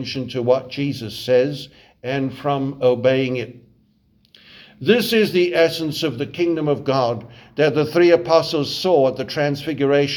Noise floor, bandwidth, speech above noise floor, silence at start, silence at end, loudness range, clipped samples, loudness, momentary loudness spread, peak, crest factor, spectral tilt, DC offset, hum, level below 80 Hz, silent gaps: -59 dBFS; 20 kHz; 40 dB; 0 s; 0 s; 3 LU; under 0.1%; -19 LUFS; 10 LU; -2 dBFS; 18 dB; -6 dB/octave; under 0.1%; none; -58 dBFS; none